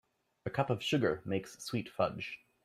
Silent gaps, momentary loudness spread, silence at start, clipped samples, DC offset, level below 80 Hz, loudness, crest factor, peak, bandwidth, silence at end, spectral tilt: none; 11 LU; 0.45 s; under 0.1%; under 0.1%; -68 dBFS; -35 LUFS; 20 dB; -16 dBFS; 15 kHz; 0.3 s; -5.5 dB/octave